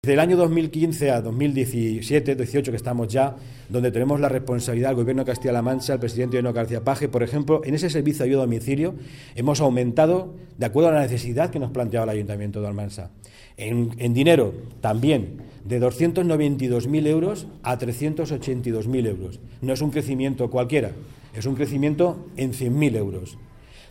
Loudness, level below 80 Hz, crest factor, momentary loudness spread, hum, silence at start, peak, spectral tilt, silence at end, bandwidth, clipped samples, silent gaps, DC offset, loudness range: -23 LUFS; -48 dBFS; 18 dB; 10 LU; none; 0.05 s; -4 dBFS; -7 dB/octave; 0.05 s; 16.5 kHz; under 0.1%; none; under 0.1%; 4 LU